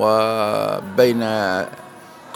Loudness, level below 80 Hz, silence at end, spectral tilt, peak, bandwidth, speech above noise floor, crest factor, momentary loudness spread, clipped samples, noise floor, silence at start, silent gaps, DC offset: -19 LUFS; -64 dBFS; 0 s; -5.5 dB/octave; 0 dBFS; 18 kHz; 22 dB; 18 dB; 10 LU; under 0.1%; -40 dBFS; 0 s; none; under 0.1%